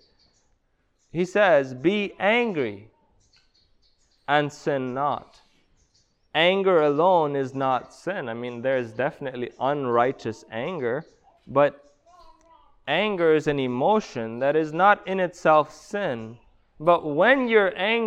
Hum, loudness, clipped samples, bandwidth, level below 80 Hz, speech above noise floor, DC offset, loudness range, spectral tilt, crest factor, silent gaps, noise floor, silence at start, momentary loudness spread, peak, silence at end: none; -23 LUFS; under 0.1%; 9 kHz; -62 dBFS; 46 dB; under 0.1%; 5 LU; -6 dB/octave; 20 dB; none; -68 dBFS; 1.15 s; 13 LU; -6 dBFS; 0 s